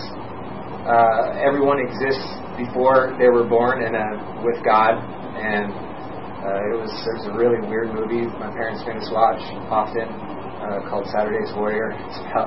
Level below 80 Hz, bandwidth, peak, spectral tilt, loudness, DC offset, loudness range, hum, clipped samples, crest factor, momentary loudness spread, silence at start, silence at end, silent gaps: -50 dBFS; 5.8 kHz; -2 dBFS; -10 dB/octave; -21 LUFS; 1%; 5 LU; none; under 0.1%; 18 dB; 15 LU; 0 s; 0 s; none